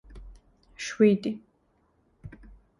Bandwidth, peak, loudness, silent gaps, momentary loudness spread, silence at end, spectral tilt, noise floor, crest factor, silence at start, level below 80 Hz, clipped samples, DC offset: 11.5 kHz; -8 dBFS; -25 LUFS; none; 26 LU; 0.5 s; -6 dB/octave; -68 dBFS; 22 dB; 0.1 s; -54 dBFS; under 0.1%; under 0.1%